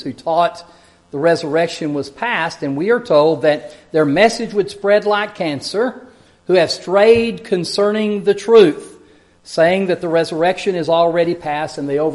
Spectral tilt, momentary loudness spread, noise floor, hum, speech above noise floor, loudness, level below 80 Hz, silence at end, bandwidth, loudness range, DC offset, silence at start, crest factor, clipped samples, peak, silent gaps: -5 dB/octave; 10 LU; -48 dBFS; none; 33 dB; -16 LUFS; -54 dBFS; 0 s; 11.5 kHz; 3 LU; under 0.1%; 0 s; 16 dB; under 0.1%; 0 dBFS; none